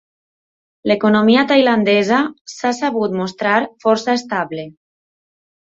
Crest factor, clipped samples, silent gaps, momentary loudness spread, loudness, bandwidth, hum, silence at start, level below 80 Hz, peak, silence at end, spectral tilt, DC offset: 16 dB; under 0.1%; 2.41-2.45 s; 12 LU; -16 LUFS; 7.8 kHz; none; 0.85 s; -60 dBFS; -2 dBFS; 1.1 s; -5 dB/octave; under 0.1%